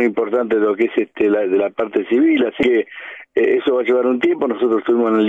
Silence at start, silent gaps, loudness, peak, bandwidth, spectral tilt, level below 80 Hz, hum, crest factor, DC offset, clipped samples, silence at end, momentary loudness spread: 0 s; none; -17 LUFS; -4 dBFS; 7.4 kHz; -7 dB/octave; -58 dBFS; none; 12 dB; under 0.1%; under 0.1%; 0 s; 4 LU